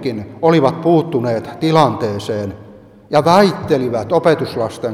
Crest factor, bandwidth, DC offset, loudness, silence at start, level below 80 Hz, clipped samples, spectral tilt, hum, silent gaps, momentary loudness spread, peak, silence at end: 16 dB; 15 kHz; under 0.1%; -15 LUFS; 0 s; -52 dBFS; under 0.1%; -6.5 dB/octave; none; none; 9 LU; 0 dBFS; 0 s